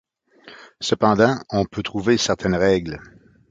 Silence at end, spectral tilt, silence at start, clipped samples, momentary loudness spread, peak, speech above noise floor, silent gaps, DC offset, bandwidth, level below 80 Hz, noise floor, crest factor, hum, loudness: 0.5 s; -5 dB/octave; 0.45 s; under 0.1%; 11 LU; -2 dBFS; 28 dB; none; under 0.1%; 9.2 kHz; -46 dBFS; -48 dBFS; 20 dB; none; -20 LUFS